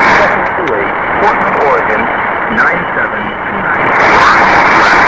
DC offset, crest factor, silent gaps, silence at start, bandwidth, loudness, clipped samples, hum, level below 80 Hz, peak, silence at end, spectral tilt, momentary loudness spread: 0.4%; 10 dB; none; 0 s; 8 kHz; -9 LUFS; 0.3%; none; -36 dBFS; 0 dBFS; 0 s; -4.5 dB/octave; 8 LU